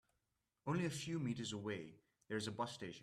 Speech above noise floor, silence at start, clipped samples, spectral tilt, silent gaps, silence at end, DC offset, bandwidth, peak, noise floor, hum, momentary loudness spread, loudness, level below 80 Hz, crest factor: 44 dB; 0.65 s; under 0.1%; -5 dB/octave; none; 0 s; under 0.1%; 13.5 kHz; -28 dBFS; -88 dBFS; none; 8 LU; -44 LUFS; -78 dBFS; 16 dB